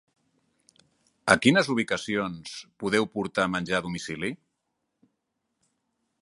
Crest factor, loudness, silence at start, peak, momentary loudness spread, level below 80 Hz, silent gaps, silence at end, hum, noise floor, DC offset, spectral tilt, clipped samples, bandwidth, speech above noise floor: 26 dB; -26 LUFS; 1.25 s; -2 dBFS; 14 LU; -62 dBFS; none; 1.85 s; none; -80 dBFS; under 0.1%; -4.5 dB/octave; under 0.1%; 11.5 kHz; 54 dB